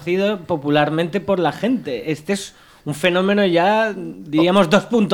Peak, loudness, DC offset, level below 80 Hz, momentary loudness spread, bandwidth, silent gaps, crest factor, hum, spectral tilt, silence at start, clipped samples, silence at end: -2 dBFS; -18 LUFS; under 0.1%; -56 dBFS; 10 LU; 17.5 kHz; none; 16 dB; none; -5.5 dB/octave; 0 s; under 0.1%; 0 s